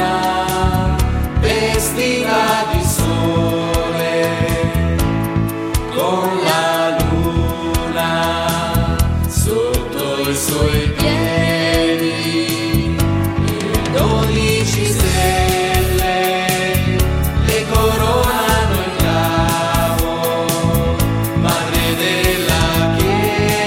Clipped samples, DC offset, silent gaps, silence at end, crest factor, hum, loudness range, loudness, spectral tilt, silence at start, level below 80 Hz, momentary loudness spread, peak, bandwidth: under 0.1%; under 0.1%; none; 0 s; 14 dB; none; 2 LU; -16 LUFS; -5 dB/octave; 0 s; -24 dBFS; 3 LU; 0 dBFS; 16.5 kHz